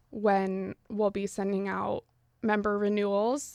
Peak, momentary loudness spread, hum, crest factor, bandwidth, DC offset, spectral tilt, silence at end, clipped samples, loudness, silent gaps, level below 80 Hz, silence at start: -12 dBFS; 8 LU; none; 18 dB; 13.5 kHz; under 0.1%; -6 dB/octave; 0 s; under 0.1%; -30 LUFS; none; -62 dBFS; 0.1 s